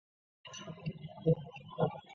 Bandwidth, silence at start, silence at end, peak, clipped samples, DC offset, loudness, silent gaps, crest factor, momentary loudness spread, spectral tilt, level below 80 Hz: 7.4 kHz; 0.45 s; 0 s; -18 dBFS; under 0.1%; under 0.1%; -37 LUFS; none; 20 dB; 15 LU; -7 dB/octave; -66 dBFS